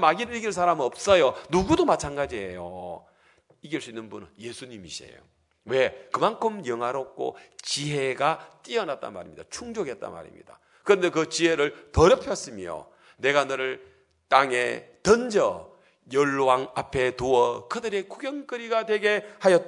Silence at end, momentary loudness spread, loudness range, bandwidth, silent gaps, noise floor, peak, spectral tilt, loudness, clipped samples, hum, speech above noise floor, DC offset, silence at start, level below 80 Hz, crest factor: 0 s; 18 LU; 7 LU; 11 kHz; none; -61 dBFS; -2 dBFS; -4.5 dB/octave; -25 LUFS; under 0.1%; none; 36 dB; under 0.1%; 0 s; -50 dBFS; 24 dB